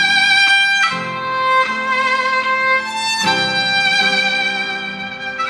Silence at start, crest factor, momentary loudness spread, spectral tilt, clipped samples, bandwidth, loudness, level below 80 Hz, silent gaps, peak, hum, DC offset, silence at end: 0 s; 14 dB; 11 LU; -1.5 dB/octave; under 0.1%; 14 kHz; -14 LUFS; -60 dBFS; none; -2 dBFS; none; under 0.1%; 0 s